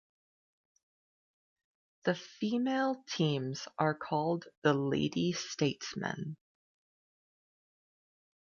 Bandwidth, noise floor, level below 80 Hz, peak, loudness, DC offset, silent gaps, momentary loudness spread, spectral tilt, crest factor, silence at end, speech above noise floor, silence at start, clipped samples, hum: 7.4 kHz; under -90 dBFS; -74 dBFS; -14 dBFS; -34 LUFS; under 0.1%; 4.57-4.62 s; 7 LU; -5.5 dB/octave; 22 dB; 2.25 s; over 57 dB; 2.05 s; under 0.1%; none